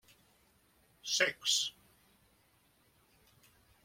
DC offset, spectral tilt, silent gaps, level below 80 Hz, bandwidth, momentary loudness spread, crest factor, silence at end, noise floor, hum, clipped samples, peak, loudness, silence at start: under 0.1%; 1 dB/octave; none; -78 dBFS; 16.5 kHz; 10 LU; 24 dB; 2.15 s; -70 dBFS; none; under 0.1%; -16 dBFS; -32 LUFS; 1.05 s